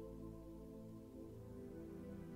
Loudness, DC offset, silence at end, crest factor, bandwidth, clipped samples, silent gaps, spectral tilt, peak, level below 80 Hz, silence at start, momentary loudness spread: -54 LUFS; under 0.1%; 0 s; 12 dB; 16 kHz; under 0.1%; none; -8.5 dB/octave; -40 dBFS; -64 dBFS; 0 s; 3 LU